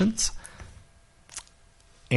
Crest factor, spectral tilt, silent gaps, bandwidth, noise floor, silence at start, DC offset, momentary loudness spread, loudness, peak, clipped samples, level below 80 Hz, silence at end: 22 dB; -4 dB/octave; none; 11.5 kHz; -57 dBFS; 0 s; under 0.1%; 22 LU; -31 LUFS; -8 dBFS; under 0.1%; -46 dBFS; 0 s